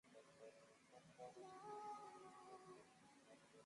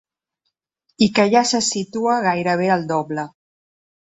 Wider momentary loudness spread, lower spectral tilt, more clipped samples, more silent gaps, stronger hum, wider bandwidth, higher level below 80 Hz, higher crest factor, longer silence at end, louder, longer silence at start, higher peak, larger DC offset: first, 13 LU vs 10 LU; about the same, -4 dB/octave vs -4 dB/octave; neither; neither; neither; first, 11 kHz vs 8.4 kHz; second, under -90 dBFS vs -60 dBFS; about the same, 18 dB vs 18 dB; second, 0 s vs 0.75 s; second, -61 LUFS vs -19 LUFS; second, 0.05 s vs 1 s; second, -44 dBFS vs -2 dBFS; neither